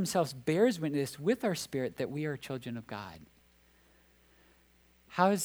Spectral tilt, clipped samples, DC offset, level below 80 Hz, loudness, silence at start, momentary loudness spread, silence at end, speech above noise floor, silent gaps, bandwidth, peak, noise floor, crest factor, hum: -5 dB/octave; under 0.1%; under 0.1%; -68 dBFS; -33 LUFS; 0 s; 13 LU; 0 s; 33 dB; none; over 20 kHz; -12 dBFS; -65 dBFS; 22 dB; none